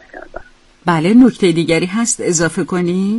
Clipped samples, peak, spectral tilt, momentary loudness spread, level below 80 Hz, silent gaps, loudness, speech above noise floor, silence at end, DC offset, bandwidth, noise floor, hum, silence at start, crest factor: under 0.1%; 0 dBFS; -5 dB/octave; 11 LU; -44 dBFS; none; -14 LUFS; 22 dB; 0 s; under 0.1%; 11.5 kHz; -35 dBFS; none; 0.15 s; 14 dB